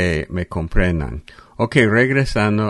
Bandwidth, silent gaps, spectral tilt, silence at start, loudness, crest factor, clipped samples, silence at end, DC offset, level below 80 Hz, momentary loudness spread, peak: 11.5 kHz; none; -6.5 dB/octave; 0 s; -18 LUFS; 18 dB; under 0.1%; 0 s; under 0.1%; -28 dBFS; 10 LU; 0 dBFS